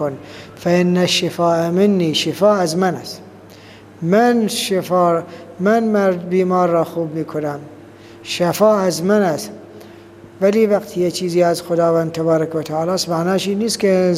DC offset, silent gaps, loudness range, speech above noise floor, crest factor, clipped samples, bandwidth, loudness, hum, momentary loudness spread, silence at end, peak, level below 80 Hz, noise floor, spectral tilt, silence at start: under 0.1%; none; 2 LU; 24 dB; 16 dB; under 0.1%; 15.5 kHz; -17 LUFS; none; 11 LU; 0 s; -2 dBFS; -62 dBFS; -40 dBFS; -5 dB/octave; 0 s